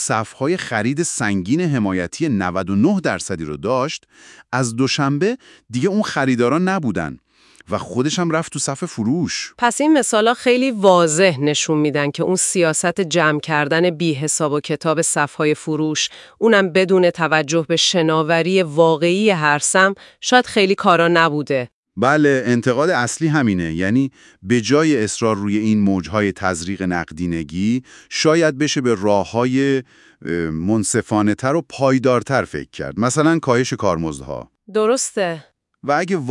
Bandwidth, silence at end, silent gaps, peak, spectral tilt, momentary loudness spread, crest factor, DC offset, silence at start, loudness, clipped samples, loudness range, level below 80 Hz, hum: 12 kHz; 0 s; 21.73-21.83 s; 0 dBFS; -4.5 dB/octave; 9 LU; 18 dB; under 0.1%; 0 s; -18 LUFS; under 0.1%; 5 LU; -54 dBFS; none